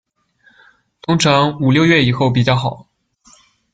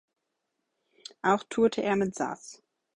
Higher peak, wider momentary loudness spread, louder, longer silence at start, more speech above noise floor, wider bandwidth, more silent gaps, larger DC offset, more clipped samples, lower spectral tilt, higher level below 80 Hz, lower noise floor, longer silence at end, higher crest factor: first, -2 dBFS vs -10 dBFS; second, 8 LU vs 22 LU; first, -14 LUFS vs -28 LUFS; second, 1.1 s vs 1.25 s; second, 42 dB vs 54 dB; second, 9.2 kHz vs 11 kHz; neither; neither; neither; about the same, -5.5 dB/octave vs -5 dB/octave; first, -48 dBFS vs -68 dBFS; second, -55 dBFS vs -82 dBFS; first, 0.95 s vs 0.4 s; about the same, 16 dB vs 20 dB